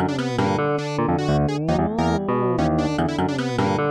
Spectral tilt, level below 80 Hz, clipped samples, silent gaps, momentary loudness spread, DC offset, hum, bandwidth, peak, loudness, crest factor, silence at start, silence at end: -7 dB/octave; -40 dBFS; under 0.1%; none; 2 LU; under 0.1%; none; 11 kHz; -8 dBFS; -22 LUFS; 14 dB; 0 s; 0 s